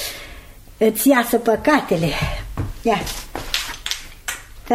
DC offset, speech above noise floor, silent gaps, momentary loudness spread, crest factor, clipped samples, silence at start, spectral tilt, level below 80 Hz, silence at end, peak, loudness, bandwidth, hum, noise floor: under 0.1%; 22 dB; none; 14 LU; 20 dB; under 0.1%; 0 s; -4 dB/octave; -36 dBFS; 0 s; 0 dBFS; -20 LUFS; 16 kHz; none; -40 dBFS